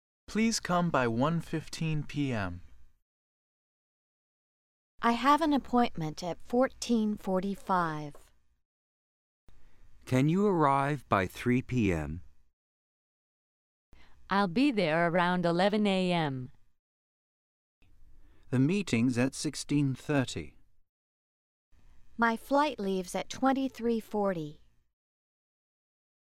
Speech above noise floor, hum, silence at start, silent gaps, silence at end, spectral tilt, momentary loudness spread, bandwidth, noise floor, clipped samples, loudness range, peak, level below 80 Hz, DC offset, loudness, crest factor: 23 dB; none; 0.3 s; 3.02-4.98 s, 8.65-9.47 s, 12.53-13.92 s, 16.79-17.82 s, 20.89-21.72 s; 1.65 s; -6 dB/octave; 10 LU; 15 kHz; -52 dBFS; under 0.1%; 5 LU; -12 dBFS; -56 dBFS; under 0.1%; -30 LUFS; 20 dB